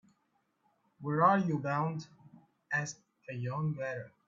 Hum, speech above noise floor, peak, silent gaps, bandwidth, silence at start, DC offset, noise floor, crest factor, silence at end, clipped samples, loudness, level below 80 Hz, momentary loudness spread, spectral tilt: none; 45 dB; -12 dBFS; none; 7.6 kHz; 1 s; under 0.1%; -77 dBFS; 24 dB; 0.2 s; under 0.1%; -33 LUFS; -76 dBFS; 17 LU; -6.5 dB/octave